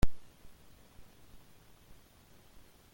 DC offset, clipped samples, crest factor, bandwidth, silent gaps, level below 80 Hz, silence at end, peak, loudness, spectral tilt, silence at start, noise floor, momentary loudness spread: under 0.1%; under 0.1%; 22 dB; 17 kHz; none; -44 dBFS; 0 s; -12 dBFS; -53 LUFS; -6 dB/octave; 0 s; -61 dBFS; 1 LU